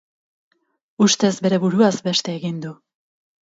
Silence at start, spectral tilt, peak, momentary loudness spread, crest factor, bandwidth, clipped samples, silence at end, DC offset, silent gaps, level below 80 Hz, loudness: 1 s; -4.5 dB/octave; -2 dBFS; 12 LU; 18 dB; 8 kHz; under 0.1%; 0.7 s; under 0.1%; none; -66 dBFS; -19 LUFS